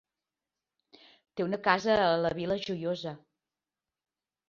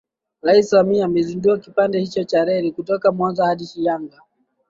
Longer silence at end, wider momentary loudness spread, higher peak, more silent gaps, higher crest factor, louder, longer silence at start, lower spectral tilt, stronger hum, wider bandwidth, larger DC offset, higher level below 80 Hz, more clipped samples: first, 1.3 s vs 0.65 s; first, 16 LU vs 7 LU; second, -10 dBFS vs -2 dBFS; neither; first, 24 dB vs 16 dB; second, -29 LUFS vs -18 LUFS; first, 1.35 s vs 0.45 s; about the same, -5.5 dB/octave vs -6.5 dB/octave; neither; about the same, 7.4 kHz vs 7.6 kHz; neither; second, -66 dBFS vs -58 dBFS; neither